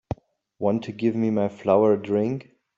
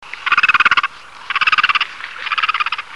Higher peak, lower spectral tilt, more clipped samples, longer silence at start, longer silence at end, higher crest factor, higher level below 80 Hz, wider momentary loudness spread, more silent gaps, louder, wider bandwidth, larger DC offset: second, -6 dBFS vs 0 dBFS; first, -9 dB/octave vs 0 dB/octave; neither; about the same, 0.1 s vs 0 s; first, 0.35 s vs 0 s; about the same, 18 dB vs 16 dB; about the same, -56 dBFS vs -56 dBFS; first, 14 LU vs 11 LU; neither; second, -23 LUFS vs -14 LUFS; second, 7.4 kHz vs 11.5 kHz; second, under 0.1% vs 0.6%